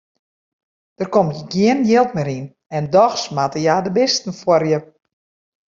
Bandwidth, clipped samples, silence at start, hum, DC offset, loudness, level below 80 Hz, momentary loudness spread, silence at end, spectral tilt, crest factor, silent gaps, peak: 7.6 kHz; under 0.1%; 1 s; none; under 0.1%; -17 LUFS; -58 dBFS; 11 LU; 0.95 s; -5 dB/octave; 16 dB; 2.66-2.70 s; -2 dBFS